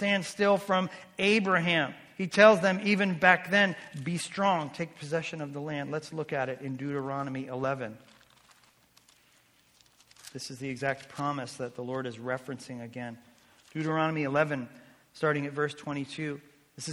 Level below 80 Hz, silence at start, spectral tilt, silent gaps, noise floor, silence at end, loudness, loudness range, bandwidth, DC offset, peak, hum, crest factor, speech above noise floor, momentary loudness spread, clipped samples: -72 dBFS; 0 s; -5 dB/octave; none; -64 dBFS; 0 s; -29 LUFS; 14 LU; 16 kHz; under 0.1%; -4 dBFS; none; 26 dB; 35 dB; 17 LU; under 0.1%